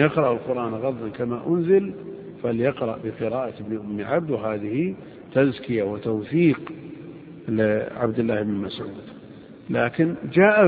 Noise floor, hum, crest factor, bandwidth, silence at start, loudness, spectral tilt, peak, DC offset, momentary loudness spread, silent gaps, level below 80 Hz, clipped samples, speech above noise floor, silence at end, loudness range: -43 dBFS; none; 20 dB; 4.9 kHz; 0 s; -24 LUFS; -11 dB/octave; -2 dBFS; under 0.1%; 17 LU; none; -58 dBFS; under 0.1%; 21 dB; 0 s; 3 LU